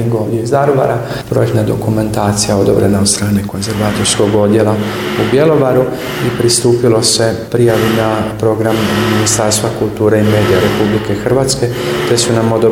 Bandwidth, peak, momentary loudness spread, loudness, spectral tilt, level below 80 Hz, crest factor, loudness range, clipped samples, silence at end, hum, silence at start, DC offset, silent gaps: 17.5 kHz; 0 dBFS; 6 LU; -12 LUFS; -5 dB/octave; -38 dBFS; 12 dB; 1 LU; under 0.1%; 0 s; none; 0 s; under 0.1%; none